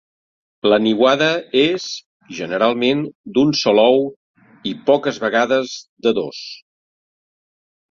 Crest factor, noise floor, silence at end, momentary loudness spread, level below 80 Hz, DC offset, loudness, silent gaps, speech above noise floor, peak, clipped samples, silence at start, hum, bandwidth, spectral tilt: 16 dB; under -90 dBFS; 1.35 s; 15 LU; -62 dBFS; under 0.1%; -17 LUFS; 2.06-2.20 s, 3.15-3.24 s, 4.16-4.34 s, 5.89-5.97 s; over 73 dB; -2 dBFS; under 0.1%; 0.65 s; none; 7.4 kHz; -4.5 dB/octave